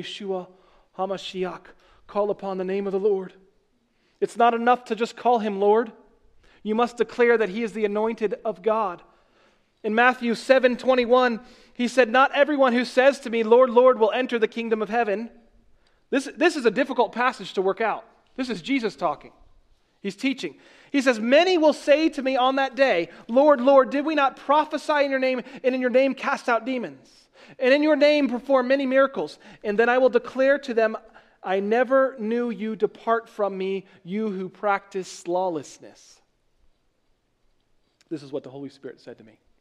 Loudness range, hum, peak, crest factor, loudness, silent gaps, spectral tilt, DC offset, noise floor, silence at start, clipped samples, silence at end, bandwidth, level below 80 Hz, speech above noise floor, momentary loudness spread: 9 LU; none; -2 dBFS; 20 dB; -22 LUFS; none; -5 dB/octave; under 0.1%; -68 dBFS; 0 s; under 0.1%; 0.45 s; 11 kHz; -64 dBFS; 46 dB; 15 LU